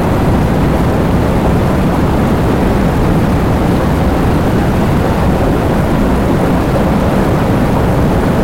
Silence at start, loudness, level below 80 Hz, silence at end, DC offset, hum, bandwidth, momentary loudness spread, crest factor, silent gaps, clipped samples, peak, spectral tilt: 0 s; -12 LUFS; -20 dBFS; 0 s; 2%; none; 16.5 kHz; 1 LU; 10 dB; none; under 0.1%; 0 dBFS; -7.5 dB/octave